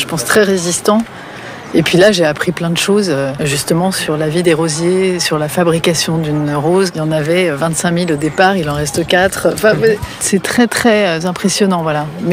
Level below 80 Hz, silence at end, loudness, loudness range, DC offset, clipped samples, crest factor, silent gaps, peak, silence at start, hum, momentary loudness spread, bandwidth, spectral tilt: -44 dBFS; 0 s; -13 LUFS; 1 LU; under 0.1%; under 0.1%; 12 dB; none; -2 dBFS; 0 s; none; 5 LU; 16 kHz; -4.5 dB/octave